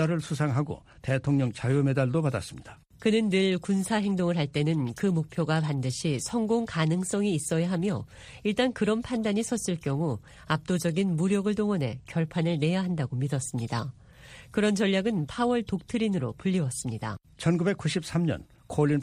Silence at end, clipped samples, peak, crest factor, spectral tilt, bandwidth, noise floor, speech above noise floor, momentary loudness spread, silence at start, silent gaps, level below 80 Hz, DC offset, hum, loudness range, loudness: 0 s; under 0.1%; -10 dBFS; 18 dB; -6 dB/octave; 14.5 kHz; -50 dBFS; 22 dB; 7 LU; 0 s; none; -56 dBFS; under 0.1%; none; 2 LU; -28 LUFS